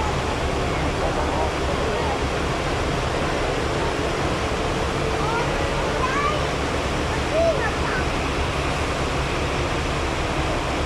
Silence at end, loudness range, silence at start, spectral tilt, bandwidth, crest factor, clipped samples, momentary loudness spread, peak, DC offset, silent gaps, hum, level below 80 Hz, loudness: 0 s; 1 LU; 0 s; -5 dB/octave; 14.5 kHz; 14 dB; under 0.1%; 2 LU; -10 dBFS; under 0.1%; none; none; -30 dBFS; -23 LUFS